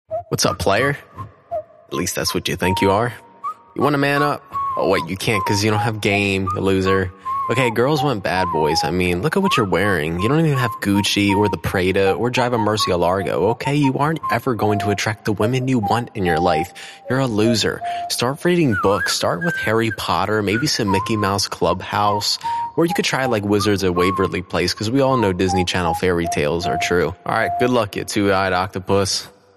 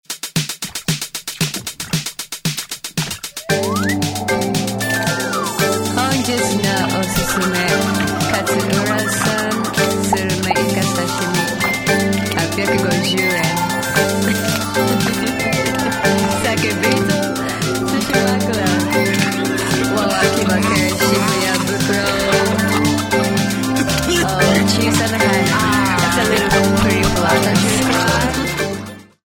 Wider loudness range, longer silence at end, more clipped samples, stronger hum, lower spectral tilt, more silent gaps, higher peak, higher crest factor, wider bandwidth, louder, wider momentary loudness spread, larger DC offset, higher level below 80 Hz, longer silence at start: second, 2 LU vs 5 LU; about the same, 0.25 s vs 0.25 s; neither; neither; about the same, -5 dB/octave vs -4 dB/octave; neither; about the same, -2 dBFS vs 0 dBFS; about the same, 16 dB vs 16 dB; second, 13.5 kHz vs over 20 kHz; second, -19 LUFS vs -16 LUFS; about the same, 5 LU vs 7 LU; second, under 0.1% vs 0.2%; second, -46 dBFS vs -38 dBFS; about the same, 0.1 s vs 0.1 s